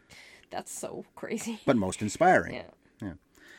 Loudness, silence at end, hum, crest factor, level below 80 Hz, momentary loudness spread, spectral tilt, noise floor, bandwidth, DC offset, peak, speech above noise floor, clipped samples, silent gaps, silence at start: -28 LUFS; 0.05 s; none; 20 dB; -64 dBFS; 19 LU; -5 dB/octave; -54 dBFS; 16.5 kHz; under 0.1%; -10 dBFS; 25 dB; under 0.1%; none; 0.1 s